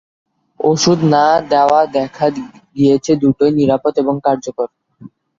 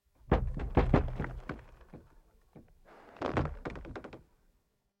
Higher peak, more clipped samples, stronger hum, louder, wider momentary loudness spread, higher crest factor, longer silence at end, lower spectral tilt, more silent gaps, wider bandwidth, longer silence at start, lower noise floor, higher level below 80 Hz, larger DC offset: first, -2 dBFS vs -10 dBFS; neither; neither; first, -14 LUFS vs -34 LUFS; second, 10 LU vs 26 LU; second, 14 dB vs 24 dB; second, 0.3 s vs 0.8 s; second, -5.5 dB/octave vs -8.5 dB/octave; neither; about the same, 7.6 kHz vs 8 kHz; first, 0.6 s vs 0.3 s; second, -40 dBFS vs -75 dBFS; second, -52 dBFS vs -40 dBFS; neither